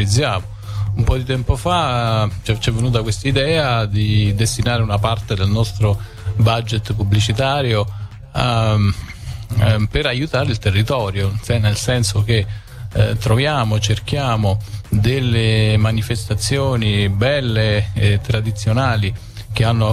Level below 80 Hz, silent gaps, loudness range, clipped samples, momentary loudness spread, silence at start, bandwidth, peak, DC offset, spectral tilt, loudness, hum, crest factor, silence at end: -32 dBFS; none; 1 LU; under 0.1%; 6 LU; 0 s; 14 kHz; -2 dBFS; under 0.1%; -5.5 dB/octave; -18 LUFS; none; 14 dB; 0 s